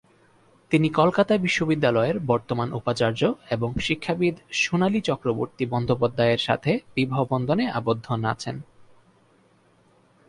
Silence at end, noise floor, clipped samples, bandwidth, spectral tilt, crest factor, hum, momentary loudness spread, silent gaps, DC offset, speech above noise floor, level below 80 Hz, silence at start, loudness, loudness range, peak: 1.45 s; -60 dBFS; under 0.1%; 11.5 kHz; -6 dB/octave; 18 dB; none; 6 LU; none; under 0.1%; 37 dB; -52 dBFS; 0.7 s; -24 LUFS; 4 LU; -6 dBFS